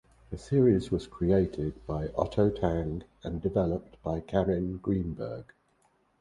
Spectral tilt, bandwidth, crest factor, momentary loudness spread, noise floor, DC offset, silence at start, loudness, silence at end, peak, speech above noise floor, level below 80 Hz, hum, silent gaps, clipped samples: -9 dB/octave; 11 kHz; 18 dB; 13 LU; -69 dBFS; under 0.1%; 0.3 s; -30 LUFS; 0.75 s; -10 dBFS; 40 dB; -46 dBFS; none; none; under 0.1%